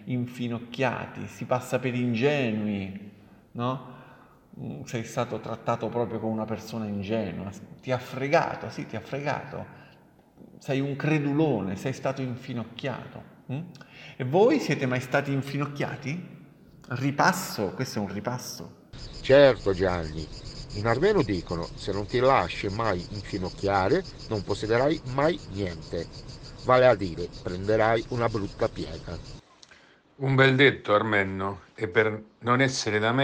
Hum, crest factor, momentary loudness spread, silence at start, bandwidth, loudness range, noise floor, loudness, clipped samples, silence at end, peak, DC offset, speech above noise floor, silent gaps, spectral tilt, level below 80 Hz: none; 22 dB; 17 LU; 0 s; 17 kHz; 7 LU; -56 dBFS; -27 LUFS; under 0.1%; 0 s; -6 dBFS; under 0.1%; 30 dB; none; -6 dB/octave; -50 dBFS